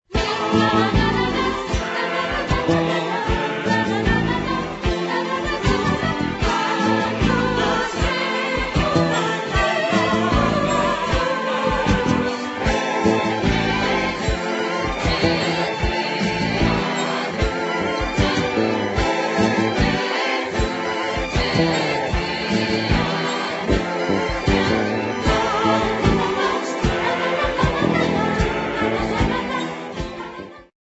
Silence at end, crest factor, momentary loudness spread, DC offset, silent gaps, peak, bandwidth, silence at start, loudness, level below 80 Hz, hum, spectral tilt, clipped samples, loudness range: 0.2 s; 18 dB; 4 LU; under 0.1%; none; -4 dBFS; 8.2 kHz; 0.1 s; -20 LUFS; -32 dBFS; none; -5.5 dB/octave; under 0.1%; 2 LU